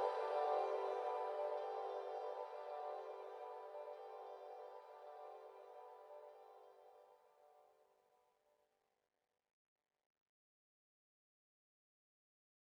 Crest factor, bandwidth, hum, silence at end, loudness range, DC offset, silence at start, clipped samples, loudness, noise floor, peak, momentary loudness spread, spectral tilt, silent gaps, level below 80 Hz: 22 dB; 11.5 kHz; none; 4.95 s; 20 LU; under 0.1%; 0 s; under 0.1%; -46 LUFS; -84 dBFS; -26 dBFS; 19 LU; -2 dB/octave; none; under -90 dBFS